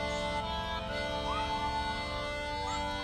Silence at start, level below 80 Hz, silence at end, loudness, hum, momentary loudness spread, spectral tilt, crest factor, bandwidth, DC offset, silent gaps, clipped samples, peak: 0 s; -44 dBFS; 0 s; -34 LUFS; none; 2 LU; -4 dB/octave; 12 dB; 14.5 kHz; under 0.1%; none; under 0.1%; -22 dBFS